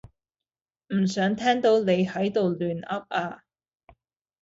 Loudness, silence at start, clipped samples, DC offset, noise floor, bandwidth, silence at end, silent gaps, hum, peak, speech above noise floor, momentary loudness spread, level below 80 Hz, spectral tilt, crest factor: -25 LUFS; 0.9 s; under 0.1%; under 0.1%; under -90 dBFS; 7.8 kHz; 1.05 s; none; none; -10 dBFS; over 66 dB; 9 LU; -64 dBFS; -6 dB/octave; 16 dB